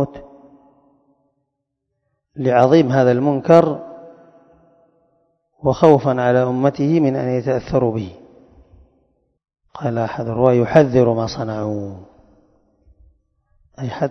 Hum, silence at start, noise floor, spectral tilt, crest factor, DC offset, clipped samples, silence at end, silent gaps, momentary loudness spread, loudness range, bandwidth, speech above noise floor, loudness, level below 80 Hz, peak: none; 0 s; -76 dBFS; -8 dB/octave; 18 dB; under 0.1%; under 0.1%; 0 s; none; 15 LU; 5 LU; 6.8 kHz; 60 dB; -17 LUFS; -50 dBFS; 0 dBFS